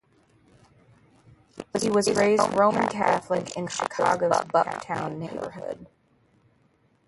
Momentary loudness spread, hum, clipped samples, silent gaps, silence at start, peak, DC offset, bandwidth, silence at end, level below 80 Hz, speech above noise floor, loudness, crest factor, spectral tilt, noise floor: 13 LU; none; under 0.1%; none; 1.55 s; -6 dBFS; under 0.1%; 12 kHz; 1.25 s; -62 dBFS; 40 dB; -25 LUFS; 20 dB; -4.5 dB/octave; -65 dBFS